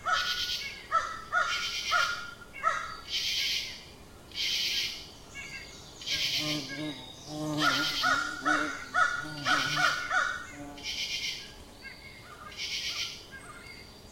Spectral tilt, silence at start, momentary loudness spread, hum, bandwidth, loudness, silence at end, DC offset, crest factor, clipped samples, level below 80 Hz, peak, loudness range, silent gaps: -1.5 dB/octave; 0 s; 18 LU; none; 16.5 kHz; -30 LUFS; 0 s; under 0.1%; 20 dB; under 0.1%; -58 dBFS; -12 dBFS; 6 LU; none